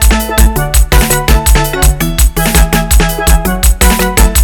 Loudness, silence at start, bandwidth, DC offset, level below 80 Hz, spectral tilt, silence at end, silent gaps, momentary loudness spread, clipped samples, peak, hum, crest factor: -10 LUFS; 0 s; 19 kHz; under 0.1%; -10 dBFS; -4 dB/octave; 0 s; none; 2 LU; 1%; 0 dBFS; none; 8 dB